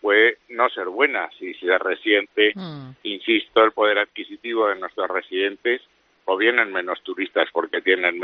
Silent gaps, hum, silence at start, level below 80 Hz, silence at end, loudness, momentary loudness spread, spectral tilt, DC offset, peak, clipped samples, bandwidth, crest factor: none; none; 0.05 s; -70 dBFS; 0 s; -21 LUFS; 11 LU; -0.5 dB/octave; under 0.1%; -2 dBFS; under 0.1%; 5.4 kHz; 20 dB